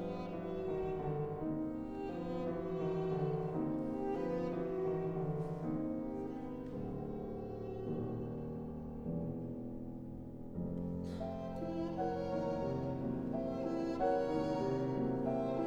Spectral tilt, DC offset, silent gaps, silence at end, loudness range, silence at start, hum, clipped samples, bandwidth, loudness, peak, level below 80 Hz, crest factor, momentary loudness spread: -9 dB/octave; under 0.1%; none; 0 s; 6 LU; 0 s; none; under 0.1%; 8.6 kHz; -40 LUFS; -22 dBFS; -56 dBFS; 16 dB; 8 LU